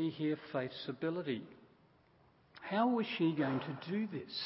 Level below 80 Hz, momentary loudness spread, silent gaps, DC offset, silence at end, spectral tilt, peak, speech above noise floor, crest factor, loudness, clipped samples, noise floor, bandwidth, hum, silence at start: -80 dBFS; 9 LU; none; under 0.1%; 0 s; -4.5 dB/octave; -20 dBFS; 31 dB; 18 dB; -37 LUFS; under 0.1%; -68 dBFS; 5.6 kHz; none; 0 s